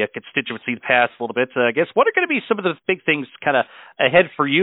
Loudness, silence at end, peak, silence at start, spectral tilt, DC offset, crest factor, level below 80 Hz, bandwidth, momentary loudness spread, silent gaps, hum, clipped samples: -19 LUFS; 0 s; 0 dBFS; 0 s; -10 dB/octave; under 0.1%; 18 dB; -64 dBFS; 4.1 kHz; 8 LU; none; none; under 0.1%